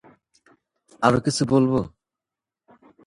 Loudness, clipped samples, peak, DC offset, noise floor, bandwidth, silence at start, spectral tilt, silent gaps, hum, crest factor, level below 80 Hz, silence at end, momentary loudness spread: -21 LUFS; under 0.1%; 0 dBFS; under 0.1%; -89 dBFS; 11.5 kHz; 1 s; -6 dB/octave; none; none; 24 dB; -54 dBFS; 1.2 s; 6 LU